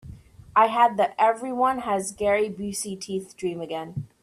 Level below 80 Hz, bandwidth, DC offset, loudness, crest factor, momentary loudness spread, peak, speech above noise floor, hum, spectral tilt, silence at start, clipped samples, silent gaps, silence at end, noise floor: -56 dBFS; 15 kHz; under 0.1%; -24 LUFS; 20 dB; 12 LU; -6 dBFS; 21 dB; none; -4.5 dB/octave; 0.05 s; under 0.1%; none; 0.15 s; -45 dBFS